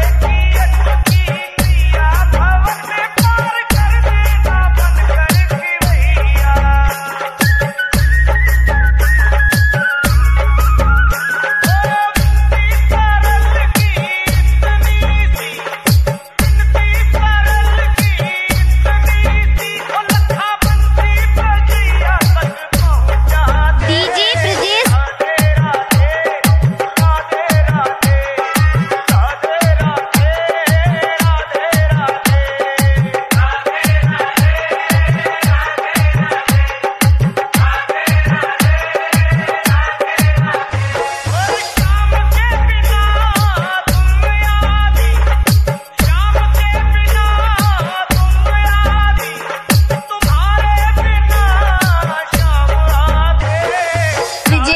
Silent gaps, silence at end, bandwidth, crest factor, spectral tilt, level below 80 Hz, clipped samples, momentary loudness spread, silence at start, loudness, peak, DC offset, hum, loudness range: none; 0 s; 15.5 kHz; 12 dB; -5 dB/octave; -14 dBFS; under 0.1%; 3 LU; 0 s; -13 LUFS; 0 dBFS; under 0.1%; none; 1 LU